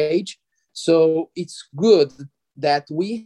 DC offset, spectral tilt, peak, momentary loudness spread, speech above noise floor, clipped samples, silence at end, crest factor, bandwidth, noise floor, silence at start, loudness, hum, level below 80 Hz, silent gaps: under 0.1%; -5.5 dB/octave; -2 dBFS; 16 LU; 22 dB; under 0.1%; 0 s; 18 dB; 11 kHz; -41 dBFS; 0 s; -19 LUFS; none; -72 dBFS; none